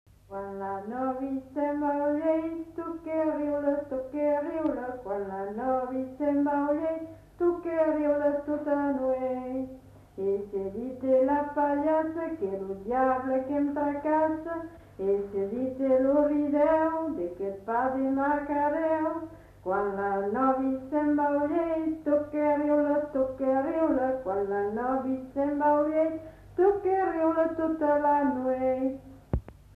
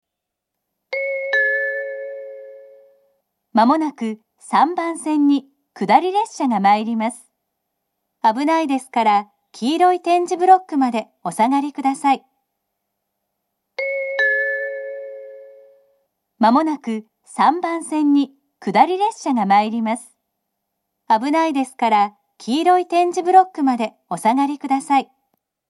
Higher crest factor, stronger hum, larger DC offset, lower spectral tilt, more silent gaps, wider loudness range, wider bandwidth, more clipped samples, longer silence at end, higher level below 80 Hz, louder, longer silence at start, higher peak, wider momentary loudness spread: second, 14 dB vs 20 dB; neither; neither; first, -9 dB/octave vs -4.5 dB/octave; neither; about the same, 3 LU vs 5 LU; second, 4.5 kHz vs 12 kHz; neither; second, 0.25 s vs 0.65 s; first, -54 dBFS vs -80 dBFS; second, -28 LUFS vs -18 LUFS; second, 0.3 s vs 0.9 s; second, -12 dBFS vs 0 dBFS; second, 10 LU vs 13 LU